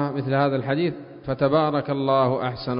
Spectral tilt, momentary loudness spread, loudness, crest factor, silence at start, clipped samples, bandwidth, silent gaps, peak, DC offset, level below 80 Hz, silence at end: -11.5 dB/octave; 7 LU; -23 LUFS; 16 dB; 0 s; under 0.1%; 5.4 kHz; none; -8 dBFS; under 0.1%; -54 dBFS; 0 s